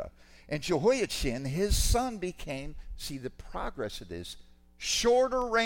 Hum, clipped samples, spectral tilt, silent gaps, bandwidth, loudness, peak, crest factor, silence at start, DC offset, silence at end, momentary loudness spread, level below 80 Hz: none; under 0.1%; -4 dB/octave; none; 17 kHz; -30 LUFS; -12 dBFS; 18 dB; 0 s; under 0.1%; 0 s; 16 LU; -38 dBFS